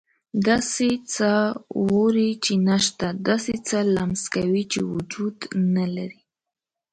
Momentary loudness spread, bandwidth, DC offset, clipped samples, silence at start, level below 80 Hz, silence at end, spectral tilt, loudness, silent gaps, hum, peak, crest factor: 8 LU; 9.4 kHz; under 0.1%; under 0.1%; 0.35 s; -56 dBFS; 0.8 s; -4.5 dB/octave; -23 LUFS; none; none; -6 dBFS; 16 dB